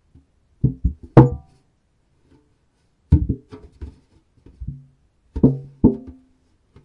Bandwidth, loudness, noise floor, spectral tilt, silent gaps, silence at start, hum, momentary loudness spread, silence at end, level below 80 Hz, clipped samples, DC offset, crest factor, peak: 4.3 kHz; -19 LUFS; -64 dBFS; -11.5 dB/octave; none; 0.65 s; none; 26 LU; 0.75 s; -32 dBFS; under 0.1%; under 0.1%; 22 dB; 0 dBFS